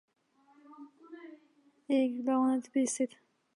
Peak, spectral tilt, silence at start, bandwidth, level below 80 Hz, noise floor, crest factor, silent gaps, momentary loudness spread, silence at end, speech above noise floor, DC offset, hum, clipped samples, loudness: -18 dBFS; -3.5 dB/octave; 0.7 s; 11.5 kHz; -88 dBFS; -67 dBFS; 16 dB; none; 24 LU; 0.5 s; 37 dB; under 0.1%; none; under 0.1%; -31 LUFS